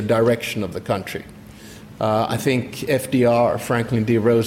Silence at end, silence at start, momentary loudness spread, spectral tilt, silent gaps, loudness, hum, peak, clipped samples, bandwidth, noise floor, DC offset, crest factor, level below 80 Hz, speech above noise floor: 0 s; 0 s; 23 LU; -6 dB/octave; none; -20 LUFS; none; -6 dBFS; under 0.1%; 16.5 kHz; -40 dBFS; under 0.1%; 14 dB; -52 dBFS; 21 dB